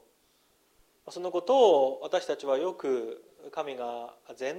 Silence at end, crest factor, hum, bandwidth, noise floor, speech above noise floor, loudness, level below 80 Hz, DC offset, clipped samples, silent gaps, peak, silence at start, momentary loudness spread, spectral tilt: 0 s; 20 dB; none; 11 kHz; -68 dBFS; 39 dB; -28 LUFS; -78 dBFS; under 0.1%; under 0.1%; none; -10 dBFS; 1.05 s; 19 LU; -4 dB/octave